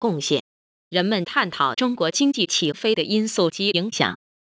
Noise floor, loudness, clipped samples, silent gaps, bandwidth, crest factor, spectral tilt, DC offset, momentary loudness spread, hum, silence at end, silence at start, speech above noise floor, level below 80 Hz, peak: under -90 dBFS; -21 LUFS; under 0.1%; 0.40-0.91 s; 8 kHz; 18 dB; -3.5 dB/octave; under 0.1%; 4 LU; none; 0.35 s; 0 s; over 68 dB; -66 dBFS; -4 dBFS